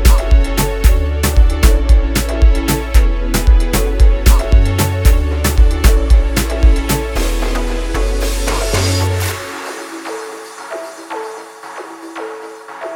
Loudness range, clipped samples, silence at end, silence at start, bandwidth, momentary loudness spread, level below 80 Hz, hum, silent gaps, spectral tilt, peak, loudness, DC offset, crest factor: 9 LU; under 0.1%; 0 s; 0 s; over 20 kHz; 15 LU; -14 dBFS; none; none; -5 dB/octave; 0 dBFS; -15 LUFS; under 0.1%; 12 dB